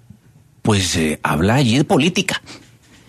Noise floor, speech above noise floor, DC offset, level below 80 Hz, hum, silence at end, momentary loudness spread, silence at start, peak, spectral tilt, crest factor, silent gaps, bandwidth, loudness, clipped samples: -50 dBFS; 33 dB; under 0.1%; -42 dBFS; none; 0.5 s; 8 LU; 0.65 s; -2 dBFS; -4.5 dB/octave; 16 dB; none; 13.5 kHz; -17 LUFS; under 0.1%